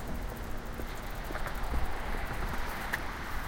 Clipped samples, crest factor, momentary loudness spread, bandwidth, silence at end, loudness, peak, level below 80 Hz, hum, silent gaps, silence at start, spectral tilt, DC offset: under 0.1%; 16 dB; 5 LU; 17 kHz; 0 s; -38 LUFS; -16 dBFS; -38 dBFS; none; none; 0 s; -4.5 dB/octave; under 0.1%